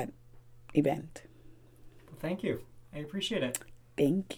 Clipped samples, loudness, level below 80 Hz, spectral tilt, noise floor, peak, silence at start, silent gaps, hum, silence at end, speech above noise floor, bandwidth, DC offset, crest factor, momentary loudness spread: under 0.1%; -34 LUFS; -60 dBFS; -5 dB/octave; -54 dBFS; -14 dBFS; 0 s; none; none; 0 s; 22 dB; 20 kHz; under 0.1%; 22 dB; 18 LU